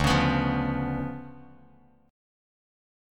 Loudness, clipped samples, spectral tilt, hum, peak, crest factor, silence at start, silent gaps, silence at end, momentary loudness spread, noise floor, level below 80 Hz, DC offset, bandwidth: -27 LUFS; under 0.1%; -6 dB/octave; none; -10 dBFS; 20 dB; 0 s; none; 1.65 s; 18 LU; -58 dBFS; -42 dBFS; under 0.1%; 14.5 kHz